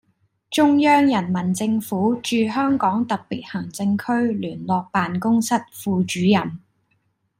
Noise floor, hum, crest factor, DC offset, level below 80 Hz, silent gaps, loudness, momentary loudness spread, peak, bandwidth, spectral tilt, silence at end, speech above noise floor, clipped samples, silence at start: -68 dBFS; none; 16 dB; under 0.1%; -62 dBFS; none; -20 LUFS; 10 LU; -4 dBFS; 16 kHz; -5.5 dB/octave; 0.85 s; 48 dB; under 0.1%; 0.5 s